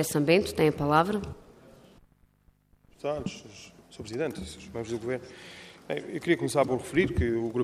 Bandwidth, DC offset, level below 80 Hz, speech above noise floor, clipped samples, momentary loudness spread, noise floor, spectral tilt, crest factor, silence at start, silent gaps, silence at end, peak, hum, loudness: 16 kHz; under 0.1%; -48 dBFS; 36 dB; under 0.1%; 21 LU; -64 dBFS; -5.5 dB/octave; 20 dB; 0 s; none; 0 s; -8 dBFS; none; -28 LUFS